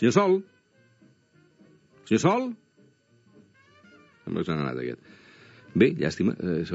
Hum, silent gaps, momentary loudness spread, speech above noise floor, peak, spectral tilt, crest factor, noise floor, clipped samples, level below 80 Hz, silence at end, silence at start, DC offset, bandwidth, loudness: none; none; 14 LU; 37 dB; -6 dBFS; -6 dB/octave; 22 dB; -61 dBFS; under 0.1%; -62 dBFS; 0 s; 0 s; under 0.1%; 8 kHz; -26 LUFS